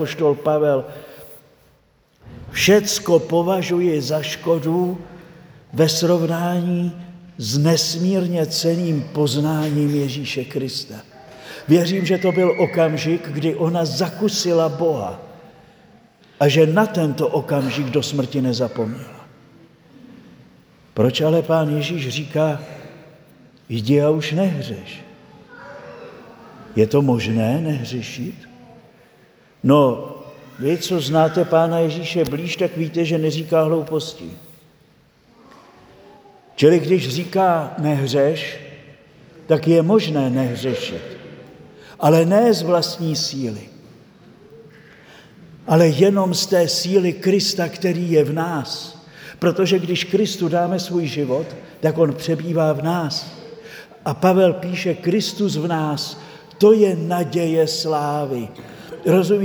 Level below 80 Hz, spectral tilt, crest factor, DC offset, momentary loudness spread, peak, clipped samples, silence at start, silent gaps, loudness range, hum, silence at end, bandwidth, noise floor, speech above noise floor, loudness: -60 dBFS; -5.5 dB/octave; 20 dB; under 0.1%; 20 LU; 0 dBFS; under 0.1%; 0 s; none; 4 LU; none; 0 s; over 20 kHz; -57 dBFS; 39 dB; -19 LUFS